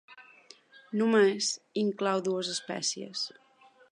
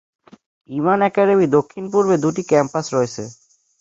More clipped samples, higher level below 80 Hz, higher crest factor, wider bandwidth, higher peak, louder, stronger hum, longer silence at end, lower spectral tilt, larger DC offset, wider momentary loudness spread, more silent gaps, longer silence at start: neither; second, -86 dBFS vs -60 dBFS; about the same, 18 dB vs 16 dB; first, 11 kHz vs 7.8 kHz; second, -12 dBFS vs -2 dBFS; second, -29 LUFS vs -18 LUFS; neither; first, 0.65 s vs 0.5 s; second, -3.5 dB/octave vs -6.5 dB/octave; neither; about the same, 11 LU vs 10 LU; neither; second, 0.1 s vs 0.7 s